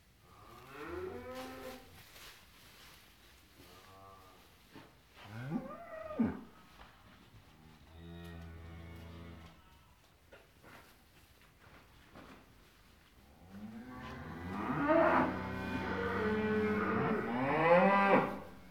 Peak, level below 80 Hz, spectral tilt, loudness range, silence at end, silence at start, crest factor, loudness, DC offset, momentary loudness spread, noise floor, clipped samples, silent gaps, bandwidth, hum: -14 dBFS; -62 dBFS; -7 dB/octave; 26 LU; 0 s; 0.35 s; 24 dB; -34 LUFS; under 0.1%; 29 LU; -65 dBFS; under 0.1%; none; 19 kHz; none